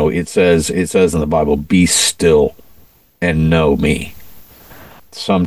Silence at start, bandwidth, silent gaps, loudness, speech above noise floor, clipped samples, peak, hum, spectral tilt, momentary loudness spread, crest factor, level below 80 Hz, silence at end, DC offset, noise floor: 0 s; 16 kHz; none; -14 LUFS; 33 dB; under 0.1%; 0 dBFS; none; -4.5 dB/octave; 9 LU; 14 dB; -32 dBFS; 0 s; 0.5%; -47 dBFS